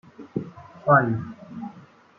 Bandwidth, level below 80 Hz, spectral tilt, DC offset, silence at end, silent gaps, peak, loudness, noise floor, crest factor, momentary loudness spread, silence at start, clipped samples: 6.4 kHz; -64 dBFS; -10 dB/octave; under 0.1%; 0.4 s; none; -4 dBFS; -23 LUFS; -49 dBFS; 22 dB; 20 LU; 0.2 s; under 0.1%